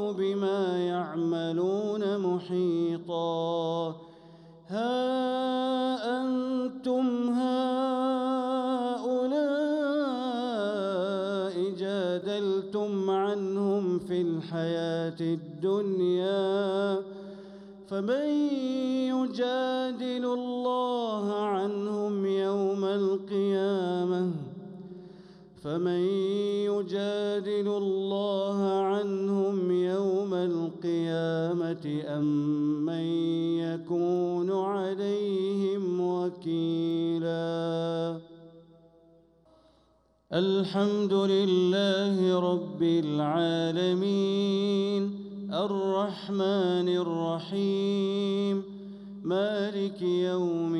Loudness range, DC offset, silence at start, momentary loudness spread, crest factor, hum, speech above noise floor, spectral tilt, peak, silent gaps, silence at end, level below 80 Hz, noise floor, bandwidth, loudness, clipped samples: 4 LU; under 0.1%; 0 s; 5 LU; 14 dB; none; 38 dB; -7 dB/octave; -14 dBFS; none; 0 s; -74 dBFS; -66 dBFS; 10.5 kHz; -29 LUFS; under 0.1%